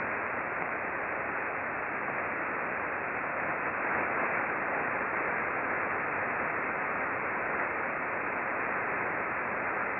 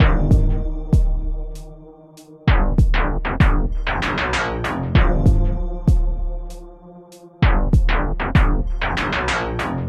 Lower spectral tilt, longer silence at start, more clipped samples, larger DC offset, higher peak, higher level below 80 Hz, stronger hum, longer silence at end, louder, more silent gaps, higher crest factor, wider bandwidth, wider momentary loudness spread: first, -9.5 dB/octave vs -6.5 dB/octave; about the same, 0 s vs 0 s; neither; neither; second, -16 dBFS vs -2 dBFS; second, -64 dBFS vs -20 dBFS; neither; about the same, 0 s vs 0 s; second, -31 LUFS vs -20 LUFS; neither; about the same, 16 dB vs 16 dB; second, 4.2 kHz vs 9.2 kHz; second, 3 LU vs 12 LU